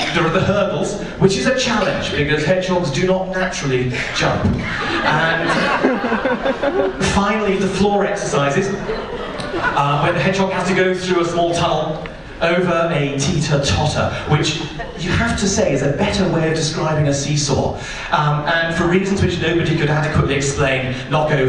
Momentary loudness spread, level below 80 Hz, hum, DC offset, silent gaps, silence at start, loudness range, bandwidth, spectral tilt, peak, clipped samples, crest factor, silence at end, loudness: 4 LU; -36 dBFS; none; under 0.1%; none; 0 s; 1 LU; 11 kHz; -5 dB/octave; 0 dBFS; under 0.1%; 16 dB; 0 s; -17 LUFS